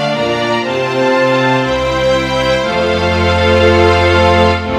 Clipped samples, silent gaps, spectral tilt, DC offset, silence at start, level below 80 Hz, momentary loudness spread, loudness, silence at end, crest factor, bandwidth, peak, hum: 0.1%; none; -5.5 dB/octave; under 0.1%; 0 s; -30 dBFS; 5 LU; -12 LUFS; 0 s; 12 dB; 12 kHz; 0 dBFS; none